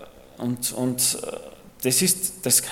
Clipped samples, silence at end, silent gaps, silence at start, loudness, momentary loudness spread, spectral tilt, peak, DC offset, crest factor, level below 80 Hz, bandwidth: under 0.1%; 0 s; none; 0 s; -22 LUFS; 13 LU; -2.5 dB/octave; -4 dBFS; under 0.1%; 20 dB; -58 dBFS; 17.5 kHz